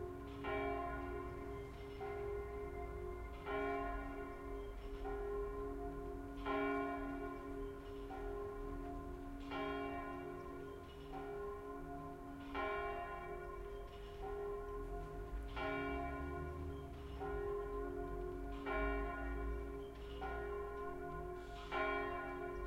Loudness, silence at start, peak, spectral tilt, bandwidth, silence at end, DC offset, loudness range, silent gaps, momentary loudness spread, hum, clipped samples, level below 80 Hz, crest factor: -46 LUFS; 0 s; -28 dBFS; -7 dB/octave; 16 kHz; 0 s; under 0.1%; 3 LU; none; 9 LU; none; under 0.1%; -52 dBFS; 18 dB